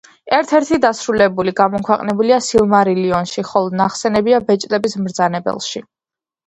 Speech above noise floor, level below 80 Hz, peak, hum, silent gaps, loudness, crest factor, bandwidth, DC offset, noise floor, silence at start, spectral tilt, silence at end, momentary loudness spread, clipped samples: 74 dB; -50 dBFS; 0 dBFS; none; none; -16 LUFS; 16 dB; 10.5 kHz; under 0.1%; -89 dBFS; 0.25 s; -5 dB/octave; 0.65 s; 6 LU; under 0.1%